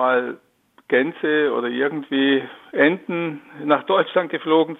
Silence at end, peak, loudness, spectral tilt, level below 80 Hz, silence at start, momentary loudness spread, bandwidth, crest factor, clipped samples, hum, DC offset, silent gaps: 0.05 s; -2 dBFS; -21 LUFS; -7.5 dB/octave; -74 dBFS; 0 s; 10 LU; 4.1 kHz; 20 dB; under 0.1%; none; under 0.1%; none